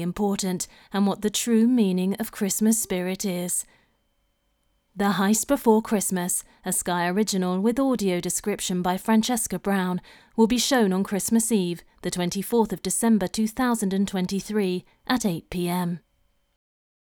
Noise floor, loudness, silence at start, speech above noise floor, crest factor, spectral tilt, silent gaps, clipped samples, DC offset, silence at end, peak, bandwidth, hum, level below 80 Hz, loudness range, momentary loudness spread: -70 dBFS; -24 LUFS; 0 s; 46 dB; 18 dB; -4.5 dB/octave; none; under 0.1%; under 0.1%; 1.05 s; -6 dBFS; over 20 kHz; none; -54 dBFS; 3 LU; 7 LU